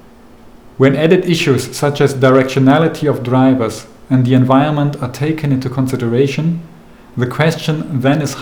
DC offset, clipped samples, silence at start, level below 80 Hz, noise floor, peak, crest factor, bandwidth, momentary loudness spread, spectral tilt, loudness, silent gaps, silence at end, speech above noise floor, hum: 0.4%; under 0.1%; 0.8 s; -48 dBFS; -40 dBFS; 0 dBFS; 14 dB; 19.5 kHz; 9 LU; -6.5 dB/octave; -14 LUFS; none; 0 s; 28 dB; none